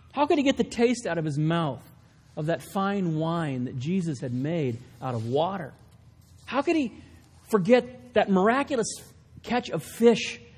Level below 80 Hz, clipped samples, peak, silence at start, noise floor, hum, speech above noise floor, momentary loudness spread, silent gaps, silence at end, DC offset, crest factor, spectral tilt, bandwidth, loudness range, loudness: -58 dBFS; under 0.1%; -6 dBFS; 0.15 s; -53 dBFS; none; 28 dB; 12 LU; none; 0.15 s; under 0.1%; 20 dB; -6 dB/octave; 16 kHz; 5 LU; -26 LUFS